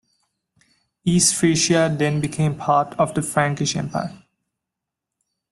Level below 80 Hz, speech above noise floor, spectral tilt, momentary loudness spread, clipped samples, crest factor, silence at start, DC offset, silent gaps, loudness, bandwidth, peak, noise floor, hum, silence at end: -54 dBFS; 65 dB; -4 dB/octave; 10 LU; under 0.1%; 18 dB; 1.05 s; under 0.1%; none; -20 LUFS; 12.5 kHz; -4 dBFS; -84 dBFS; none; 1.35 s